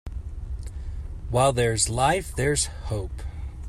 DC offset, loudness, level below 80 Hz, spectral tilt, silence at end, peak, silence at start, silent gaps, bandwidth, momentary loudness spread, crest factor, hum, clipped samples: under 0.1%; -24 LUFS; -34 dBFS; -4 dB/octave; 0 s; -8 dBFS; 0.05 s; none; 15 kHz; 16 LU; 18 dB; none; under 0.1%